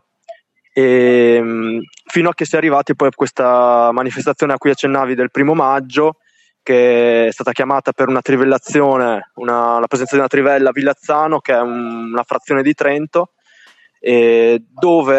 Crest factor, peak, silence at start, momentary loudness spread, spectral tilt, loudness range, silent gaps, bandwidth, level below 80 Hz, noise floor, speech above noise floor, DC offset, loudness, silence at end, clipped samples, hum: 12 dB; -2 dBFS; 0.3 s; 8 LU; -6 dB/octave; 2 LU; none; 8.2 kHz; -66 dBFS; -48 dBFS; 35 dB; under 0.1%; -14 LUFS; 0 s; under 0.1%; none